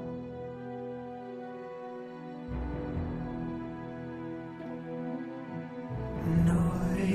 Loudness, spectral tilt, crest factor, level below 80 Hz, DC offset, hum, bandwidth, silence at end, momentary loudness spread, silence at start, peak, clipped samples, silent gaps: -35 LUFS; -8.5 dB/octave; 18 dB; -46 dBFS; under 0.1%; none; 12 kHz; 0 s; 14 LU; 0 s; -16 dBFS; under 0.1%; none